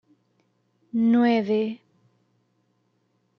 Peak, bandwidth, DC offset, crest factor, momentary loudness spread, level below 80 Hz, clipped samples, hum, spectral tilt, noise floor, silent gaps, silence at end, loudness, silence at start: -10 dBFS; 5.8 kHz; under 0.1%; 16 dB; 12 LU; -76 dBFS; under 0.1%; 60 Hz at -40 dBFS; -8 dB/octave; -70 dBFS; none; 1.65 s; -23 LUFS; 0.95 s